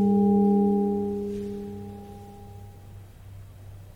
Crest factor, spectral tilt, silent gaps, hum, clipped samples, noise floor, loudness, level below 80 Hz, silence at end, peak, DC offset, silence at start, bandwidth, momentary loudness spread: 14 dB; -10.5 dB/octave; none; none; under 0.1%; -45 dBFS; -24 LUFS; -52 dBFS; 0.05 s; -12 dBFS; under 0.1%; 0 s; 4.1 kHz; 26 LU